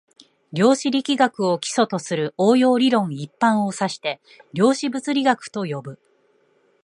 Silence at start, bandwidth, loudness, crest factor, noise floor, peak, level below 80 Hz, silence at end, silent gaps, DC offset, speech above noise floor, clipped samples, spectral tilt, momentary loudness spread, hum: 0.5 s; 11 kHz; -20 LUFS; 18 dB; -62 dBFS; -2 dBFS; -72 dBFS; 0.9 s; none; under 0.1%; 41 dB; under 0.1%; -5 dB/octave; 12 LU; none